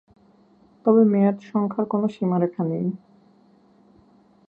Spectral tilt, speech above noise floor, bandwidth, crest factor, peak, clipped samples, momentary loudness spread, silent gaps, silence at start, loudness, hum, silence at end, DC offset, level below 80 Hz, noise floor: -10.5 dB/octave; 36 dB; 4.3 kHz; 20 dB; -4 dBFS; under 0.1%; 10 LU; none; 0.85 s; -22 LUFS; none; 1.5 s; under 0.1%; -70 dBFS; -56 dBFS